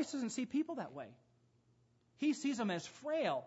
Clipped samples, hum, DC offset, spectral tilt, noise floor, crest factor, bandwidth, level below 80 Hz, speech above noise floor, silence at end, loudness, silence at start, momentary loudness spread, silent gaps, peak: under 0.1%; none; under 0.1%; -4.5 dB/octave; -73 dBFS; 16 dB; 8 kHz; -84 dBFS; 34 dB; 0 s; -39 LUFS; 0 s; 11 LU; none; -24 dBFS